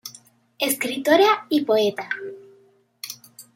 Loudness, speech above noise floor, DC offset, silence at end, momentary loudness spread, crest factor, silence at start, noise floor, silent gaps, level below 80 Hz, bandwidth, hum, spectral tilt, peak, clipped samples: -21 LUFS; 37 dB; under 0.1%; 0.15 s; 21 LU; 20 dB; 0.05 s; -57 dBFS; none; -76 dBFS; 17 kHz; none; -2.5 dB/octave; -4 dBFS; under 0.1%